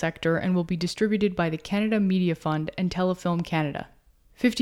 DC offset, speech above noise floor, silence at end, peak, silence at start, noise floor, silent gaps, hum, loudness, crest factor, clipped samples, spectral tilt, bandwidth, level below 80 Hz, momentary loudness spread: under 0.1%; 23 dB; 0 s; -10 dBFS; 0 s; -48 dBFS; none; none; -26 LUFS; 16 dB; under 0.1%; -6.5 dB/octave; 12.5 kHz; -52 dBFS; 5 LU